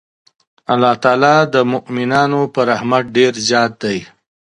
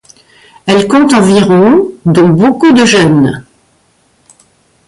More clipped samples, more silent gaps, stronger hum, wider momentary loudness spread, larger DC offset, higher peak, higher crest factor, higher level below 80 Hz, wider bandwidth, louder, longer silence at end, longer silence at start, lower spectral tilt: neither; neither; neither; first, 9 LU vs 6 LU; neither; about the same, 0 dBFS vs 0 dBFS; first, 16 dB vs 8 dB; second, -58 dBFS vs -44 dBFS; about the same, 11.5 kHz vs 11.5 kHz; second, -14 LUFS vs -7 LUFS; second, 0.55 s vs 1.45 s; about the same, 0.7 s vs 0.65 s; second, -4.5 dB/octave vs -6 dB/octave